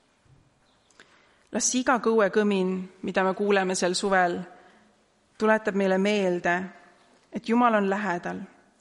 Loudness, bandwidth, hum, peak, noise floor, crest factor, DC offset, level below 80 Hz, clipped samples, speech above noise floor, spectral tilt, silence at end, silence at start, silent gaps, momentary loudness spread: -25 LUFS; 11.5 kHz; none; -8 dBFS; -64 dBFS; 18 dB; under 0.1%; -66 dBFS; under 0.1%; 39 dB; -4 dB/octave; 0.35 s; 1.5 s; none; 14 LU